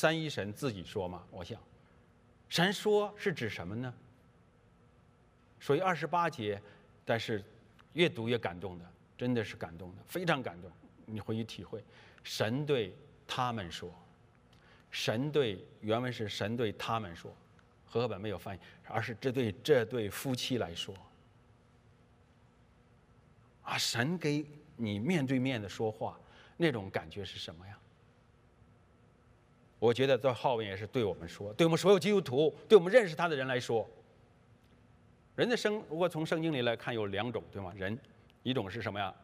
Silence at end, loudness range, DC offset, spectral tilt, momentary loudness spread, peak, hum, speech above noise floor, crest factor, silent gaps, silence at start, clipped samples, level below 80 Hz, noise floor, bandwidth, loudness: 0.1 s; 9 LU; under 0.1%; -5.5 dB/octave; 16 LU; -10 dBFS; none; 31 dB; 24 dB; none; 0 s; under 0.1%; -70 dBFS; -64 dBFS; 15.5 kHz; -33 LUFS